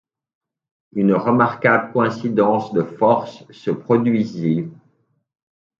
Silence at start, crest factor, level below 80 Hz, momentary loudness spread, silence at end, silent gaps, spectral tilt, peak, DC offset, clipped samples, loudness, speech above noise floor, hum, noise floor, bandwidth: 0.95 s; 20 dB; -64 dBFS; 10 LU; 1.05 s; none; -8.5 dB/octave; 0 dBFS; under 0.1%; under 0.1%; -18 LUFS; 47 dB; none; -65 dBFS; 7.2 kHz